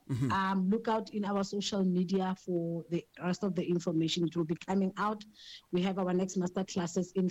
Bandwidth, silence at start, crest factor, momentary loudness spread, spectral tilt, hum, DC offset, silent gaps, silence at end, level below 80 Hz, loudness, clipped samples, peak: 8.6 kHz; 0.1 s; 10 dB; 6 LU; -6 dB/octave; none; under 0.1%; none; 0 s; -68 dBFS; -33 LUFS; under 0.1%; -22 dBFS